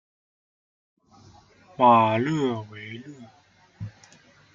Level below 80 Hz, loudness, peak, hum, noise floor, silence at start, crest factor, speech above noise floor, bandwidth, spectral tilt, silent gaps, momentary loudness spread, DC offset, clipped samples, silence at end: -66 dBFS; -21 LUFS; -6 dBFS; none; -55 dBFS; 1.8 s; 22 dB; 33 dB; 7.6 kHz; -7 dB/octave; none; 24 LU; under 0.1%; under 0.1%; 0.65 s